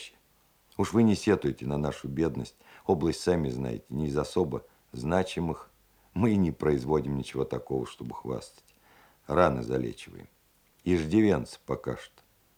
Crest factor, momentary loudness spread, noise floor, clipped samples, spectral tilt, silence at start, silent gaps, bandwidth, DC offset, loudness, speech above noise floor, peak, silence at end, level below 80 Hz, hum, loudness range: 22 dB; 15 LU; -66 dBFS; under 0.1%; -7 dB/octave; 0 s; none; 17 kHz; under 0.1%; -29 LUFS; 37 dB; -6 dBFS; 0.5 s; -52 dBFS; none; 3 LU